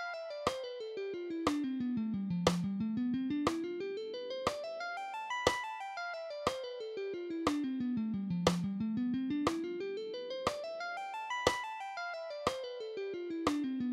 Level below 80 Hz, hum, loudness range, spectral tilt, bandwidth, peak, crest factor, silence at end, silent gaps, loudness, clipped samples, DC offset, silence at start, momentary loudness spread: -64 dBFS; none; 2 LU; -5 dB/octave; 15.5 kHz; -12 dBFS; 26 dB; 0 s; none; -37 LUFS; under 0.1%; under 0.1%; 0 s; 8 LU